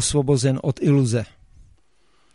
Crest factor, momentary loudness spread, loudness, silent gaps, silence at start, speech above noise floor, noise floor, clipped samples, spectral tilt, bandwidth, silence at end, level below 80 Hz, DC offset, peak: 16 dB; 7 LU; -20 LUFS; none; 0 s; 44 dB; -64 dBFS; under 0.1%; -5.5 dB/octave; 11.5 kHz; 1.1 s; -46 dBFS; under 0.1%; -6 dBFS